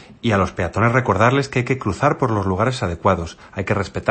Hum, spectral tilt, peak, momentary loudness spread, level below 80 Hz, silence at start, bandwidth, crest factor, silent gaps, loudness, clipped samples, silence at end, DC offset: none; -6.5 dB/octave; -2 dBFS; 6 LU; -42 dBFS; 0 s; 8.8 kHz; 18 dB; none; -19 LUFS; under 0.1%; 0 s; under 0.1%